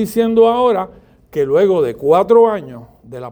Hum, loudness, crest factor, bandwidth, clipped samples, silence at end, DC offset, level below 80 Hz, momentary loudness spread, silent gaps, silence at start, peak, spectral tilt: none; -13 LUFS; 14 dB; over 20 kHz; under 0.1%; 0 s; under 0.1%; -50 dBFS; 19 LU; none; 0 s; 0 dBFS; -6.5 dB/octave